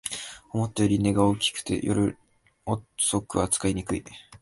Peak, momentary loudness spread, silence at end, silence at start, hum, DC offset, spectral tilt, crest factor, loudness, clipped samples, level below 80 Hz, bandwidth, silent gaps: -8 dBFS; 11 LU; 0.2 s; 0.05 s; none; under 0.1%; -4.5 dB/octave; 20 dB; -26 LUFS; under 0.1%; -48 dBFS; 12 kHz; none